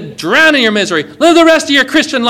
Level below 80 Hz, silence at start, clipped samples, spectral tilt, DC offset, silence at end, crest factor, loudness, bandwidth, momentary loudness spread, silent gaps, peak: -48 dBFS; 0 s; 3%; -3 dB/octave; under 0.1%; 0 s; 10 dB; -8 LUFS; 17.5 kHz; 6 LU; none; 0 dBFS